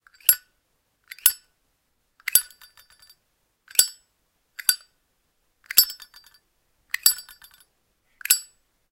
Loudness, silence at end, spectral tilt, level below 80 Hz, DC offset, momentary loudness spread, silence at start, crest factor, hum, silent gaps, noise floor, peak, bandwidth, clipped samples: -21 LUFS; 0.5 s; 4 dB/octave; -68 dBFS; under 0.1%; 18 LU; 0.3 s; 28 dB; none; none; -72 dBFS; 0 dBFS; 17 kHz; under 0.1%